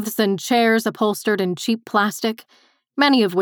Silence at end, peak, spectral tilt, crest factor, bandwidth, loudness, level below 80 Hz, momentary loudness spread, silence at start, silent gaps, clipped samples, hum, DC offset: 0 s; -4 dBFS; -4 dB/octave; 16 dB; over 20 kHz; -19 LUFS; -84 dBFS; 9 LU; 0 s; none; under 0.1%; none; under 0.1%